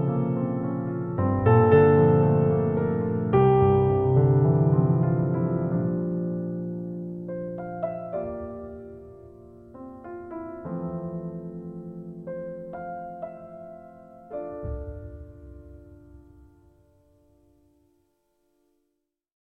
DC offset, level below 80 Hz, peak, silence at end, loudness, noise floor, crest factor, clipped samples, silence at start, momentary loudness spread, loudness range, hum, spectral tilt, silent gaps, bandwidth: under 0.1%; -50 dBFS; -6 dBFS; 3.25 s; -24 LUFS; -79 dBFS; 20 dB; under 0.1%; 0 s; 22 LU; 20 LU; none; -12.5 dB/octave; none; 3.8 kHz